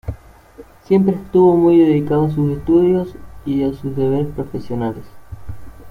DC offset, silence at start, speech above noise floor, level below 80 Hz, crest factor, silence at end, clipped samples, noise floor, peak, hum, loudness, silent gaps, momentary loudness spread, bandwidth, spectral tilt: under 0.1%; 0.05 s; 27 dB; -40 dBFS; 14 dB; 0 s; under 0.1%; -42 dBFS; -2 dBFS; none; -16 LUFS; none; 21 LU; 5 kHz; -10 dB/octave